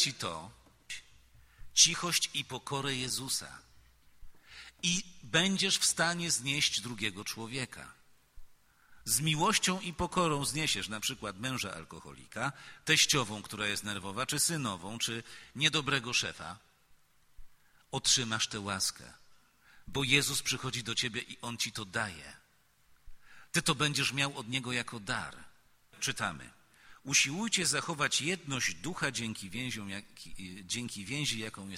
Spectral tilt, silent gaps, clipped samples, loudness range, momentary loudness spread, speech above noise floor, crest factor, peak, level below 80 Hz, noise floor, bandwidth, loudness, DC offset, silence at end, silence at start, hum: -2 dB/octave; none; under 0.1%; 4 LU; 18 LU; 34 dB; 26 dB; -8 dBFS; -60 dBFS; -68 dBFS; 16.5 kHz; -31 LUFS; under 0.1%; 0 s; 0 s; none